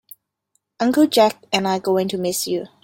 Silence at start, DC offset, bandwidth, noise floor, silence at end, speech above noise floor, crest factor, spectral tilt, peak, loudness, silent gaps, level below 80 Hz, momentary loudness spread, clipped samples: 0.8 s; under 0.1%; 17 kHz; -70 dBFS; 0.15 s; 52 dB; 18 dB; -4 dB/octave; -2 dBFS; -19 LUFS; none; -62 dBFS; 8 LU; under 0.1%